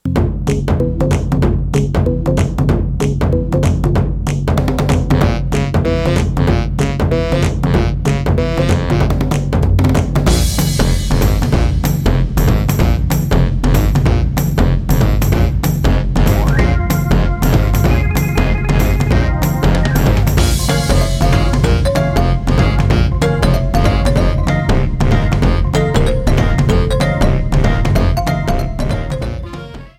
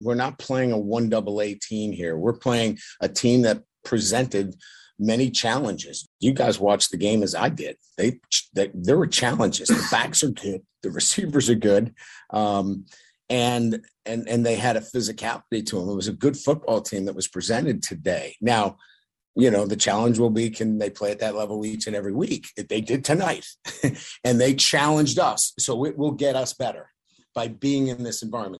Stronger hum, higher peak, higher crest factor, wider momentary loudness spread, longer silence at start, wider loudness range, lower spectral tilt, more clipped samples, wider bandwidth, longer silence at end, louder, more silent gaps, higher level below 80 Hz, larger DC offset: neither; first, 0 dBFS vs -6 dBFS; second, 12 dB vs 18 dB; second, 3 LU vs 10 LU; about the same, 0.05 s vs 0 s; second, 1 LU vs 4 LU; first, -6.5 dB/octave vs -4 dB/octave; neither; first, 16 kHz vs 12.5 kHz; about the same, 0.1 s vs 0 s; first, -15 LUFS vs -23 LUFS; second, none vs 6.07-6.19 s, 19.27-19.34 s; first, -18 dBFS vs -60 dBFS; neither